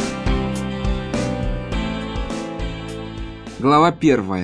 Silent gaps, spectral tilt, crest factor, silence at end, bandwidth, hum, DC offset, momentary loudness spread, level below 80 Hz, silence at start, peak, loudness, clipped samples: none; -6 dB/octave; 18 dB; 0 s; 11 kHz; none; under 0.1%; 16 LU; -30 dBFS; 0 s; -4 dBFS; -21 LUFS; under 0.1%